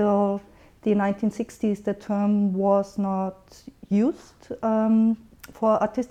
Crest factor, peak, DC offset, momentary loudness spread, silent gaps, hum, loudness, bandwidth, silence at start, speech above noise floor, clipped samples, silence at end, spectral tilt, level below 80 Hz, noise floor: 14 dB; -10 dBFS; under 0.1%; 9 LU; none; none; -24 LUFS; 13.5 kHz; 0 s; 19 dB; under 0.1%; 0.05 s; -8.5 dB/octave; -58 dBFS; -42 dBFS